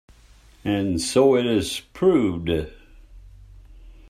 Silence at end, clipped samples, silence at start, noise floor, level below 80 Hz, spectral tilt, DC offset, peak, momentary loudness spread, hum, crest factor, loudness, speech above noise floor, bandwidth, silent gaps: 0.15 s; under 0.1%; 0.65 s; -51 dBFS; -46 dBFS; -5.5 dB/octave; under 0.1%; -6 dBFS; 11 LU; none; 18 dB; -22 LUFS; 31 dB; 16 kHz; none